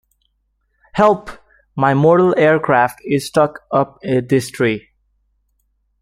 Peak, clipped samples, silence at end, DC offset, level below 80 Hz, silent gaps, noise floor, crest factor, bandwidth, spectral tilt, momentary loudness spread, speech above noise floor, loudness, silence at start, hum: -2 dBFS; under 0.1%; 1.25 s; under 0.1%; -52 dBFS; none; -66 dBFS; 16 dB; 15.5 kHz; -6.5 dB/octave; 10 LU; 51 dB; -16 LUFS; 0.95 s; none